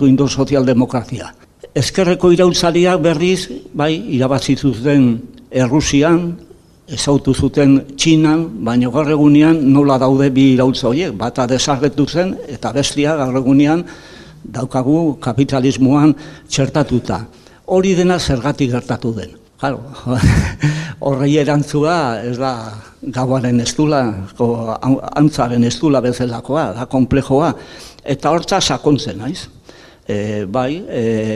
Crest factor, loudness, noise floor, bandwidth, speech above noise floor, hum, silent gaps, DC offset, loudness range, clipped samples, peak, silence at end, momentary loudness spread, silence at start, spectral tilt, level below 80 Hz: 14 dB; -15 LUFS; -42 dBFS; 12.5 kHz; 27 dB; none; none; under 0.1%; 5 LU; under 0.1%; 0 dBFS; 0 s; 12 LU; 0 s; -6 dB/octave; -36 dBFS